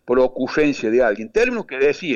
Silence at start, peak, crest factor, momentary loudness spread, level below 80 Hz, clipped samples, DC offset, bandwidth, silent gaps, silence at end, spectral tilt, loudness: 0.05 s; -8 dBFS; 12 dB; 2 LU; -44 dBFS; under 0.1%; under 0.1%; 8.2 kHz; none; 0 s; -5.5 dB/octave; -19 LUFS